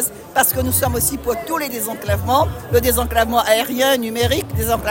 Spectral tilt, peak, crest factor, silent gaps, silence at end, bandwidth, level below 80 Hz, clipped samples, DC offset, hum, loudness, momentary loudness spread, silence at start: -3.5 dB/octave; -2 dBFS; 16 dB; none; 0 s; 17 kHz; -34 dBFS; under 0.1%; under 0.1%; none; -18 LUFS; 6 LU; 0 s